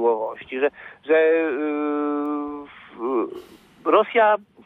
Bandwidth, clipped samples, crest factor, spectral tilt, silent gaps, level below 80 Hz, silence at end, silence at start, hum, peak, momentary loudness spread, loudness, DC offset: 4 kHz; under 0.1%; 18 dB; -6.5 dB/octave; none; -68 dBFS; 0.25 s; 0 s; none; -4 dBFS; 15 LU; -22 LUFS; under 0.1%